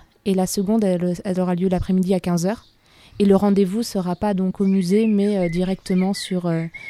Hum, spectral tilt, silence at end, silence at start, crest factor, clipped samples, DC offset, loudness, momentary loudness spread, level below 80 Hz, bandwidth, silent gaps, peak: none; -7 dB/octave; 0 s; 0.25 s; 16 dB; under 0.1%; under 0.1%; -20 LUFS; 6 LU; -44 dBFS; 14 kHz; none; -4 dBFS